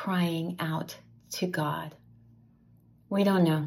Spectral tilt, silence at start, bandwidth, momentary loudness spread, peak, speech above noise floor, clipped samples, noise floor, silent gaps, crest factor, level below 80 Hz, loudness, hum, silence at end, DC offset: -6.5 dB/octave; 0 s; 16 kHz; 17 LU; -14 dBFS; 32 dB; under 0.1%; -60 dBFS; none; 16 dB; -70 dBFS; -30 LUFS; none; 0 s; under 0.1%